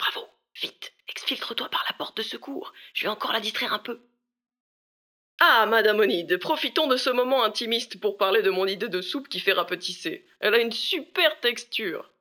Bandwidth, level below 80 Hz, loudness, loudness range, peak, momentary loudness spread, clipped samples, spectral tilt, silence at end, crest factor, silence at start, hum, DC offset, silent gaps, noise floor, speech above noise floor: over 20 kHz; -84 dBFS; -24 LUFS; 8 LU; -4 dBFS; 13 LU; under 0.1%; -2.5 dB/octave; 0.2 s; 22 dB; 0 s; none; under 0.1%; 4.60-5.38 s; under -90 dBFS; over 65 dB